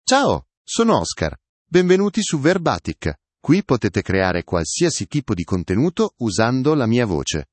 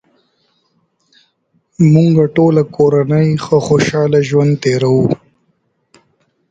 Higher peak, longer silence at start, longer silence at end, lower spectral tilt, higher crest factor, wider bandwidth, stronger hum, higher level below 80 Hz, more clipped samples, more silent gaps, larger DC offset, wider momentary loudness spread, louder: about the same, -2 dBFS vs 0 dBFS; second, 0.05 s vs 1.8 s; second, 0.1 s vs 1.35 s; second, -5 dB/octave vs -7.5 dB/octave; about the same, 18 dB vs 14 dB; about the same, 8.8 kHz vs 8 kHz; neither; about the same, -44 dBFS vs -48 dBFS; neither; first, 0.57-0.65 s, 1.49-1.65 s vs none; neither; first, 9 LU vs 4 LU; second, -19 LUFS vs -12 LUFS